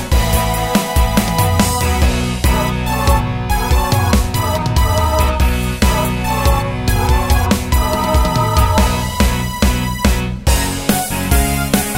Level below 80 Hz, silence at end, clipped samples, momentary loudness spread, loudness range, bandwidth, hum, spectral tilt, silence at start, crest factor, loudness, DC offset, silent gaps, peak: -18 dBFS; 0 s; under 0.1%; 3 LU; 1 LU; 16.5 kHz; none; -5 dB/octave; 0 s; 14 dB; -15 LUFS; under 0.1%; none; 0 dBFS